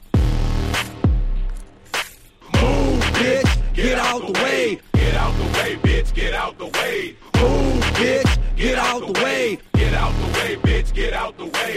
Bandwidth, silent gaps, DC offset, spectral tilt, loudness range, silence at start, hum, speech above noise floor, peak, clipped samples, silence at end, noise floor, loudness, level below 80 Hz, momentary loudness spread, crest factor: 15 kHz; none; under 0.1%; -5 dB/octave; 2 LU; 0 s; none; 22 dB; -4 dBFS; under 0.1%; 0 s; -41 dBFS; -20 LUFS; -22 dBFS; 7 LU; 14 dB